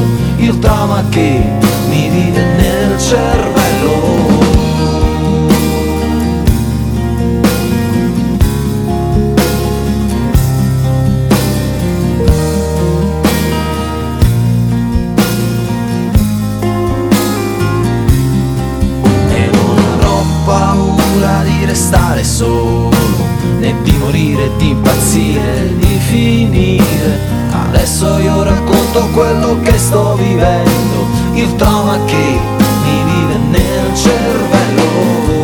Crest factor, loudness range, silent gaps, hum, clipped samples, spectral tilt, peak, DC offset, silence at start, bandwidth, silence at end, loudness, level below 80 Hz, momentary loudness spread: 10 dB; 2 LU; none; none; 0.2%; -6 dB/octave; 0 dBFS; under 0.1%; 0 s; over 20 kHz; 0 s; -11 LUFS; -20 dBFS; 4 LU